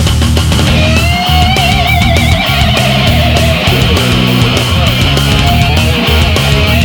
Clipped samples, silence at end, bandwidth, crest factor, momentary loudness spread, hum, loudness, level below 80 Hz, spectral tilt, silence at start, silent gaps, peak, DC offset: 0.1%; 0 s; over 20 kHz; 8 dB; 1 LU; none; -8 LUFS; -16 dBFS; -5 dB/octave; 0 s; none; 0 dBFS; under 0.1%